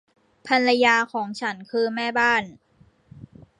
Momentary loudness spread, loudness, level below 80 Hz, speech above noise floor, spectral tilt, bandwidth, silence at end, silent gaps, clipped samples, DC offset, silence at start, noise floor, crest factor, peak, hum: 11 LU; -21 LUFS; -66 dBFS; 31 dB; -3.5 dB/octave; 11 kHz; 0.35 s; none; under 0.1%; under 0.1%; 0.45 s; -53 dBFS; 20 dB; -4 dBFS; none